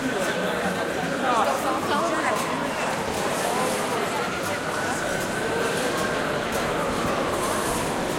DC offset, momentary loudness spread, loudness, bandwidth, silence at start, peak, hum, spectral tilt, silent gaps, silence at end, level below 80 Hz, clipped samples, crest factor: under 0.1%; 3 LU; -25 LUFS; 16.5 kHz; 0 s; -8 dBFS; none; -3.5 dB/octave; none; 0 s; -48 dBFS; under 0.1%; 16 dB